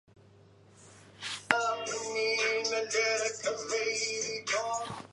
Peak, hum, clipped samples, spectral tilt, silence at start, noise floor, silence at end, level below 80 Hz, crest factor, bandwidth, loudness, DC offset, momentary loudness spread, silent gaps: -2 dBFS; none; under 0.1%; -0.5 dB/octave; 0.8 s; -58 dBFS; 0.05 s; -72 dBFS; 32 dB; 11.5 kHz; -31 LUFS; under 0.1%; 7 LU; none